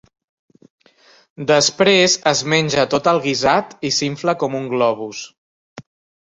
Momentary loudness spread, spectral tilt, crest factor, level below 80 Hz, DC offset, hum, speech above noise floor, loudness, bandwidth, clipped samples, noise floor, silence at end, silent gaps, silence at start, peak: 13 LU; -3 dB/octave; 18 dB; -56 dBFS; under 0.1%; none; 35 dB; -16 LUFS; 8.2 kHz; under 0.1%; -52 dBFS; 0.4 s; 5.38-5.76 s; 1.4 s; -2 dBFS